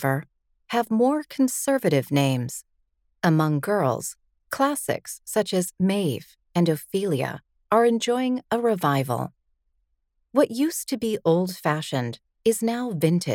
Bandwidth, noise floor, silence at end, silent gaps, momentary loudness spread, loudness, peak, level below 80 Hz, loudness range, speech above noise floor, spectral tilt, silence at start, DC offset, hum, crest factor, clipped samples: 19 kHz; -72 dBFS; 0 s; none; 8 LU; -24 LUFS; -6 dBFS; -66 dBFS; 2 LU; 49 dB; -5.5 dB/octave; 0 s; under 0.1%; none; 18 dB; under 0.1%